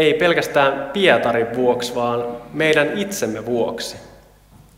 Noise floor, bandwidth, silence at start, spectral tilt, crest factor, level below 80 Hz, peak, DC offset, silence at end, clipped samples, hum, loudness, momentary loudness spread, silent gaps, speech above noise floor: -48 dBFS; 16.5 kHz; 0 s; -4 dB/octave; 18 dB; -52 dBFS; 0 dBFS; under 0.1%; 0.6 s; under 0.1%; none; -19 LUFS; 10 LU; none; 30 dB